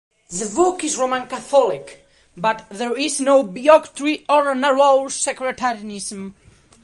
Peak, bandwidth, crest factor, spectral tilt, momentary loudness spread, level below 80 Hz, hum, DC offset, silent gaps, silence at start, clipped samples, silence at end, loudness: -2 dBFS; 11.5 kHz; 18 dB; -3 dB/octave; 14 LU; -58 dBFS; none; under 0.1%; none; 0.3 s; under 0.1%; 0.55 s; -19 LUFS